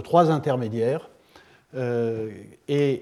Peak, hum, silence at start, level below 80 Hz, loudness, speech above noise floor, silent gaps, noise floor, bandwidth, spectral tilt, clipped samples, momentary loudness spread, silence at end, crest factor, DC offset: -4 dBFS; none; 0 s; -70 dBFS; -25 LUFS; 31 dB; none; -54 dBFS; 13 kHz; -8 dB/octave; under 0.1%; 15 LU; 0 s; 20 dB; under 0.1%